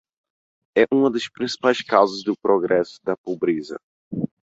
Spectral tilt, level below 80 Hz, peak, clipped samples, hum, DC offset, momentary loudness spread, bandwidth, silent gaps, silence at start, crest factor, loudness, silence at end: -5.5 dB/octave; -64 dBFS; -2 dBFS; under 0.1%; none; under 0.1%; 11 LU; 8 kHz; 3.18-3.24 s, 3.83-4.11 s; 0.75 s; 20 dB; -21 LUFS; 0.25 s